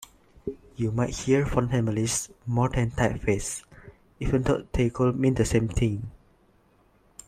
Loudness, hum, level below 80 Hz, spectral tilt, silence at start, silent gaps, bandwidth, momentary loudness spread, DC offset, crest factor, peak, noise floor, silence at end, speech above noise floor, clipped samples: -26 LUFS; none; -40 dBFS; -6 dB/octave; 0.45 s; none; 14.5 kHz; 13 LU; under 0.1%; 20 dB; -6 dBFS; -62 dBFS; 1.1 s; 37 dB; under 0.1%